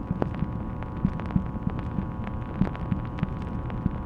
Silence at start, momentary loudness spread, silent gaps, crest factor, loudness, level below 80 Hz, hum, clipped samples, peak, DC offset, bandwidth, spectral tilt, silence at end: 0 s; 5 LU; none; 24 dB; -31 LUFS; -36 dBFS; none; under 0.1%; -6 dBFS; under 0.1%; 5.6 kHz; -10 dB/octave; 0 s